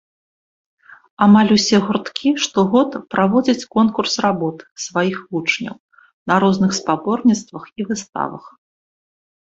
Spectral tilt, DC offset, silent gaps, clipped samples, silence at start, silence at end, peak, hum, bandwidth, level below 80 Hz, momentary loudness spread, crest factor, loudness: -5 dB/octave; under 0.1%; 4.71-4.76 s, 5.80-5.89 s, 6.13-6.26 s, 8.09-8.13 s; under 0.1%; 1.2 s; 0.95 s; -2 dBFS; none; 7.8 kHz; -58 dBFS; 12 LU; 16 dB; -17 LUFS